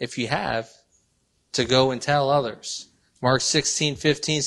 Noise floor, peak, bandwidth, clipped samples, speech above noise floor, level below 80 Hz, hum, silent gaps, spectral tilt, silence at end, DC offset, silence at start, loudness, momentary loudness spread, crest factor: -68 dBFS; -6 dBFS; 12 kHz; under 0.1%; 45 dB; -54 dBFS; none; none; -3.5 dB/octave; 0 s; under 0.1%; 0 s; -23 LUFS; 12 LU; 18 dB